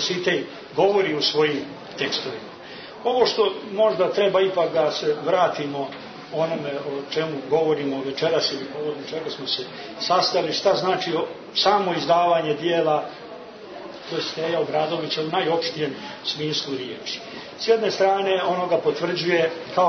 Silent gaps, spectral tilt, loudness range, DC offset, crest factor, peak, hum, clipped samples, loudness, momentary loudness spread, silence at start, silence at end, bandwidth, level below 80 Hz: none; -4.5 dB/octave; 4 LU; under 0.1%; 18 dB; -6 dBFS; none; under 0.1%; -23 LUFS; 12 LU; 0 s; 0 s; 6.6 kHz; -66 dBFS